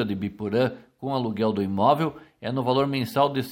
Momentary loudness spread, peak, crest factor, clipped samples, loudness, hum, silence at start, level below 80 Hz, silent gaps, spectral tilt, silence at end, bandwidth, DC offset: 8 LU; -6 dBFS; 18 dB; under 0.1%; -25 LUFS; none; 0 s; -62 dBFS; none; -7 dB/octave; 0 s; 16.5 kHz; under 0.1%